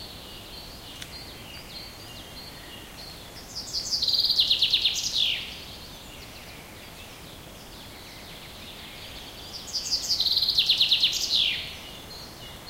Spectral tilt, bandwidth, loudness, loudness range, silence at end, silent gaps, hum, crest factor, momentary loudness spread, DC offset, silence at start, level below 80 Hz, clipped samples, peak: -0.5 dB/octave; 16 kHz; -22 LUFS; 18 LU; 0 s; none; none; 20 dB; 22 LU; under 0.1%; 0 s; -52 dBFS; under 0.1%; -8 dBFS